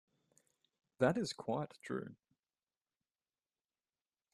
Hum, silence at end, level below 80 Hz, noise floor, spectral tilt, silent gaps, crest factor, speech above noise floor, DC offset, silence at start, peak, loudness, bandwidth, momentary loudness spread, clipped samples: none; 2.2 s; -80 dBFS; under -90 dBFS; -5.5 dB/octave; none; 24 dB; over 52 dB; under 0.1%; 1 s; -18 dBFS; -39 LUFS; 12.5 kHz; 10 LU; under 0.1%